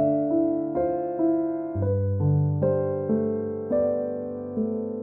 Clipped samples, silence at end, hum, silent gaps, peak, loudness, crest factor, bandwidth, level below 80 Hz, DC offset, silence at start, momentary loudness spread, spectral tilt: under 0.1%; 0 s; none; none; -12 dBFS; -25 LUFS; 12 dB; 2.6 kHz; -56 dBFS; under 0.1%; 0 s; 6 LU; -15 dB/octave